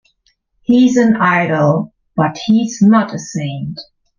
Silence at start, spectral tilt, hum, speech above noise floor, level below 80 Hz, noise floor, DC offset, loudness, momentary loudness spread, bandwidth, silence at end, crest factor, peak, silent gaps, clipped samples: 0.7 s; -6.5 dB/octave; none; 48 dB; -54 dBFS; -61 dBFS; under 0.1%; -14 LUFS; 13 LU; 7.4 kHz; 0.35 s; 12 dB; -2 dBFS; none; under 0.1%